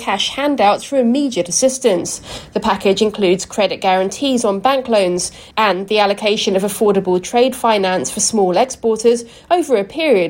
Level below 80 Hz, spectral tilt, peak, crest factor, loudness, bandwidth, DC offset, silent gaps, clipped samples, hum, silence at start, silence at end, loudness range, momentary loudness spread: -50 dBFS; -3.5 dB/octave; -2 dBFS; 14 dB; -16 LUFS; 16.5 kHz; under 0.1%; none; under 0.1%; none; 0 s; 0 s; 1 LU; 4 LU